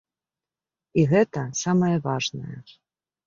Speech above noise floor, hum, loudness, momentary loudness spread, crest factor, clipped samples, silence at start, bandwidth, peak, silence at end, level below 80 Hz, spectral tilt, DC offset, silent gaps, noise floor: over 67 dB; none; -23 LUFS; 17 LU; 18 dB; under 0.1%; 0.95 s; 7.6 kHz; -6 dBFS; 0.65 s; -60 dBFS; -5.5 dB/octave; under 0.1%; none; under -90 dBFS